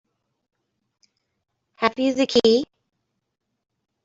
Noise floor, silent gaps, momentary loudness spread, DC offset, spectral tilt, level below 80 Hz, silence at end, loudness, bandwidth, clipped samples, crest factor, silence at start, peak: -77 dBFS; none; 7 LU; under 0.1%; -4 dB/octave; -64 dBFS; 1.4 s; -20 LUFS; 7.8 kHz; under 0.1%; 22 dB; 1.8 s; -4 dBFS